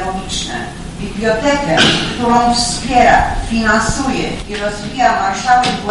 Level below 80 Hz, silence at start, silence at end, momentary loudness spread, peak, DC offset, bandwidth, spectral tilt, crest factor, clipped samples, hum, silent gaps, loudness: -28 dBFS; 0 s; 0 s; 10 LU; 0 dBFS; under 0.1%; 11.5 kHz; -3.5 dB/octave; 14 dB; under 0.1%; none; none; -14 LUFS